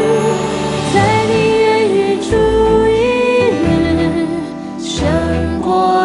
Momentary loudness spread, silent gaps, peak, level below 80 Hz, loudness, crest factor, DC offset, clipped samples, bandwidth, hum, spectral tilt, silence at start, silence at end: 6 LU; none; 0 dBFS; -30 dBFS; -14 LUFS; 12 dB; under 0.1%; under 0.1%; 11.5 kHz; none; -6 dB/octave; 0 s; 0 s